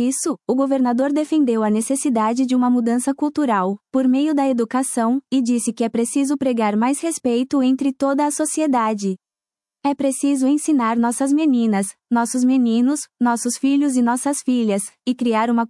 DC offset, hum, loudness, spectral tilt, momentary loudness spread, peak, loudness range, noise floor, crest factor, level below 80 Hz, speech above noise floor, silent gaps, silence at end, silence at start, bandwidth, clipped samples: under 0.1%; none; -19 LUFS; -4.5 dB/octave; 4 LU; -6 dBFS; 2 LU; under -90 dBFS; 12 dB; -70 dBFS; over 72 dB; none; 0.05 s; 0 s; 12 kHz; under 0.1%